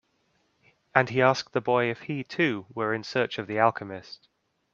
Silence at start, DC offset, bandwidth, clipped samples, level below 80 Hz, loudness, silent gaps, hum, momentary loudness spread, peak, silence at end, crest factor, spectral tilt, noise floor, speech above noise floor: 0.95 s; under 0.1%; 7.6 kHz; under 0.1%; -70 dBFS; -26 LUFS; none; none; 15 LU; -2 dBFS; 0.6 s; 26 dB; -6 dB/octave; -71 dBFS; 44 dB